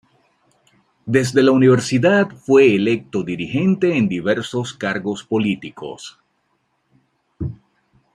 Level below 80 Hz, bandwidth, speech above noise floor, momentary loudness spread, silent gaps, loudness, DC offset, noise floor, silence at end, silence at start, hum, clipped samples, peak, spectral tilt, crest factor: -54 dBFS; 11.5 kHz; 50 dB; 18 LU; none; -17 LUFS; under 0.1%; -67 dBFS; 0.6 s; 1.05 s; none; under 0.1%; -2 dBFS; -6 dB/octave; 18 dB